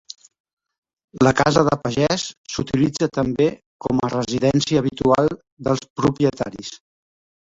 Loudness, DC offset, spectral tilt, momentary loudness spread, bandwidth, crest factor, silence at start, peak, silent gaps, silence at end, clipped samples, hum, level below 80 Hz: -20 LUFS; under 0.1%; -5.5 dB/octave; 12 LU; 8 kHz; 20 dB; 1.15 s; -2 dBFS; 2.37-2.44 s, 3.66-3.79 s, 5.52-5.57 s, 5.90-5.96 s; 0.8 s; under 0.1%; none; -48 dBFS